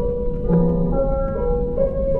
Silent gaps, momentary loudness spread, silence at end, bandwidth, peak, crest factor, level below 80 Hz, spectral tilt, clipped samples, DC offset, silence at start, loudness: none; 5 LU; 0 s; 2.5 kHz; -6 dBFS; 12 dB; -26 dBFS; -13 dB/octave; under 0.1%; under 0.1%; 0 s; -21 LUFS